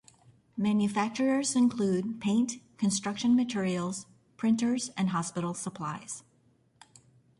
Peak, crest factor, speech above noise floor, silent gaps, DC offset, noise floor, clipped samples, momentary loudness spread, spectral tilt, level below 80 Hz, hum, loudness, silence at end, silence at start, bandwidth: -16 dBFS; 14 dB; 38 dB; none; under 0.1%; -67 dBFS; under 0.1%; 10 LU; -5 dB/octave; -70 dBFS; none; -29 LUFS; 1.2 s; 0.55 s; 11.5 kHz